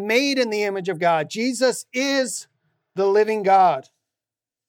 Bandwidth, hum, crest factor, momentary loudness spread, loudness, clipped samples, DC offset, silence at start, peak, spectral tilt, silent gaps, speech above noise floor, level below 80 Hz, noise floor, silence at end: 17 kHz; none; 16 dB; 9 LU; -20 LUFS; under 0.1%; under 0.1%; 0 s; -4 dBFS; -3.5 dB/octave; none; 69 dB; -80 dBFS; -89 dBFS; 0.85 s